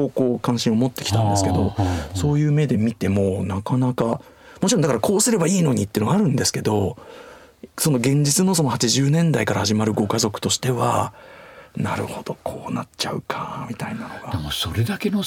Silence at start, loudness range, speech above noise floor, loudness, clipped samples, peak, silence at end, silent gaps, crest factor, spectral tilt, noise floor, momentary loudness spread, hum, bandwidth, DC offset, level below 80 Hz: 0 s; 7 LU; 23 dB; -21 LUFS; under 0.1%; -4 dBFS; 0 s; none; 16 dB; -5 dB/octave; -44 dBFS; 12 LU; none; 18 kHz; under 0.1%; -50 dBFS